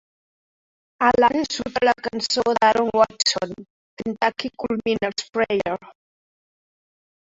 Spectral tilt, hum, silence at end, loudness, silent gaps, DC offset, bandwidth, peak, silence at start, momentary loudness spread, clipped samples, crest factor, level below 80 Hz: -3 dB/octave; none; 1.5 s; -21 LUFS; 3.70-3.97 s; under 0.1%; 8 kHz; -4 dBFS; 1 s; 11 LU; under 0.1%; 20 dB; -56 dBFS